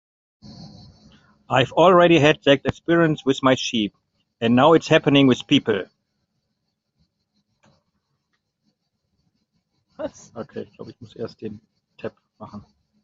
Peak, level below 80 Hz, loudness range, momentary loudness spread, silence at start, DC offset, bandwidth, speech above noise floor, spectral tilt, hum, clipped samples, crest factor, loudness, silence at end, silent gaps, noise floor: -2 dBFS; -56 dBFS; 20 LU; 23 LU; 0.5 s; under 0.1%; 7.8 kHz; 57 dB; -5.5 dB/octave; none; under 0.1%; 20 dB; -18 LUFS; 0.45 s; none; -76 dBFS